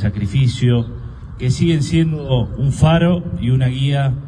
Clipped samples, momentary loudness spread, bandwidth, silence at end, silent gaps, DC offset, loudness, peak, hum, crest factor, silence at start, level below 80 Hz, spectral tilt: under 0.1%; 8 LU; 10 kHz; 0 s; none; under 0.1%; -17 LUFS; 0 dBFS; none; 16 dB; 0 s; -32 dBFS; -7 dB/octave